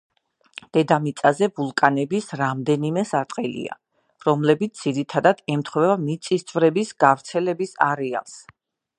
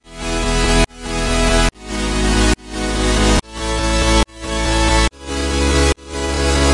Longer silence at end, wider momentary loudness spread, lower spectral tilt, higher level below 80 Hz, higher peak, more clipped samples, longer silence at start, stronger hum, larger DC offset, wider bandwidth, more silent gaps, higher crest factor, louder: first, 0.6 s vs 0 s; about the same, 9 LU vs 7 LU; first, -6 dB/octave vs -4 dB/octave; second, -70 dBFS vs -20 dBFS; about the same, 0 dBFS vs -2 dBFS; neither; first, 0.75 s vs 0.05 s; neither; second, under 0.1% vs 0.3%; about the same, 11 kHz vs 11.5 kHz; neither; first, 22 dB vs 14 dB; second, -22 LUFS vs -17 LUFS